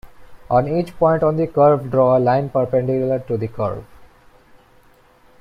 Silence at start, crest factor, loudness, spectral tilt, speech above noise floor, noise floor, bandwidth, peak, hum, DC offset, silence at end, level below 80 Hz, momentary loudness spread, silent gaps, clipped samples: 0.05 s; 16 dB; -18 LUFS; -9.5 dB/octave; 34 dB; -51 dBFS; 10.5 kHz; -4 dBFS; none; under 0.1%; 1.35 s; -48 dBFS; 10 LU; none; under 0.1%